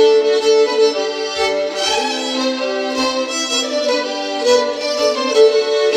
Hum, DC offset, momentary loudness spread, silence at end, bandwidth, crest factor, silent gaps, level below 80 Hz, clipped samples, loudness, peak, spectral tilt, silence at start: none; under 0.1%; 6 LU; 0 s; 13.5 kHz; 14 dB; none; -56 dBFS; under 0.1%; -16 LUFS; -2 dBFS; -0.5 dB/octave; 0 s